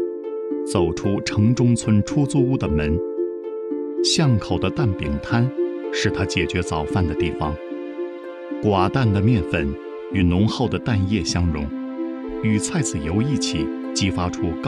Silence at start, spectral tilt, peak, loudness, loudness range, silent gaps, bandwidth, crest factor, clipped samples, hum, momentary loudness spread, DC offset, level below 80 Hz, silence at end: 0 s; -5.5 dB/octave; -6 dBFS; -22 LUFS; 3 LU; none; 11.5 kHz; 16 dB; under 0.1%; none; 10 LU; under 0.1%; -38 dBFS; 0 s